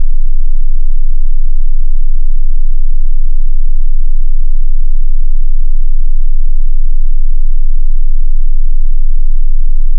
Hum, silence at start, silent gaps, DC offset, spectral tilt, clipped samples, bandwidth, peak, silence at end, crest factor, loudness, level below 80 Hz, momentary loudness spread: none; 0 s; none; under 0.1%; -15 dB/octave; under 0.1%; 0.1 kHz; 0 dBFS; 0 s; 4 dB; -19 LUFS; -6 dBFS; 1 LU